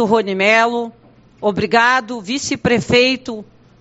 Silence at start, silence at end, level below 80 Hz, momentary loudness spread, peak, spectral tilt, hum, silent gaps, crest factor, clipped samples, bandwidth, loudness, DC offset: 0 s; 0.4 s; -50 dBFS; 12 LU; 0 dBFS; -2.5 dB/octave; none; none; 16 dB; under 0.1%; 8 kHz; -15 LUFS; under 0.1%